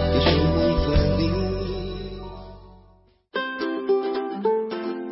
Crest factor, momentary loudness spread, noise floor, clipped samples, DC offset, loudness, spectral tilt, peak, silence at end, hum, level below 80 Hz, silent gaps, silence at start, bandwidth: 18 dB; 16 LU; -56 dBFS; under 0.1%; under 0.1%; -24 LUFS; -10 dB/octave; -6 dBFS; 0 s; none; -32 dBFS; none; 0 s; 5.8 kHz